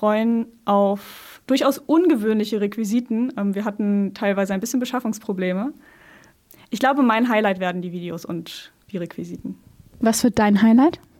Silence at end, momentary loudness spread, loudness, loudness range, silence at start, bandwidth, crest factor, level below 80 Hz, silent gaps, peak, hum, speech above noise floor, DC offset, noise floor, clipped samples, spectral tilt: 0.25 s; 15 LU; -21 LUFS; 3 LU; 0 s; 16 kHz; 14 dB; -58 dBFS; none; -6 dBFS; none; 31 dB; under 0.1%; -51 dBFS; under 0.1%; -5.5 dB/octave